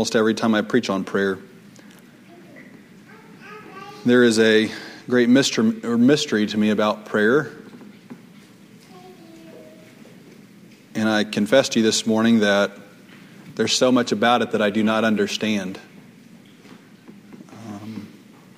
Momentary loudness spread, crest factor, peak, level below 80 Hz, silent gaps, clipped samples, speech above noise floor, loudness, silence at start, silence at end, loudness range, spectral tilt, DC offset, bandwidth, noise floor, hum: 20 LU; 18 dB; -4 dBFS; -66 dBFS; none; under 0.1%; 29 dB; -19 LUFS; 0 s; 0.5 s; 10 LU; -4.5 dB/octave; under 0.1%; 15.5 kHz; -47 dBFS; none